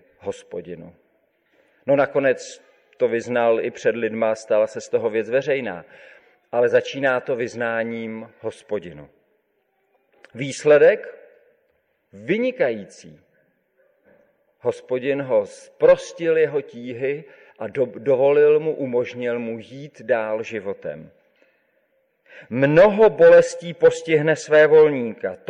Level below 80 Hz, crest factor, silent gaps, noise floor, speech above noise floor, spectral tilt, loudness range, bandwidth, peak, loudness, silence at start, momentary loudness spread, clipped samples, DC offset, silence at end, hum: -64 dBFS; 16 dB; none; -68 dBFS; 49 dB; -5.5 dB/octave; 11 LU; 10 kHz; -6 dBFS; -20 LUFS; 0.25 s; 19 LU; under 0.1%; under 0.1%; 0.15 s; none